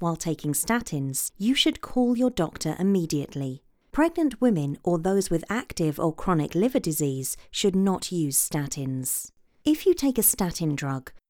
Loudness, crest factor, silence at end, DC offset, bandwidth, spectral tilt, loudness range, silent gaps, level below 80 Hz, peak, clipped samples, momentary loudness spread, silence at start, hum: -25 LUFS; 18 dB; 0.1 s; under 0.1%; over 20 kHz; -4.5 dB/octave; 1 LU; none; -50 dBFS; -8 dBFS; under 0.1%; 8 LU; 0 s; none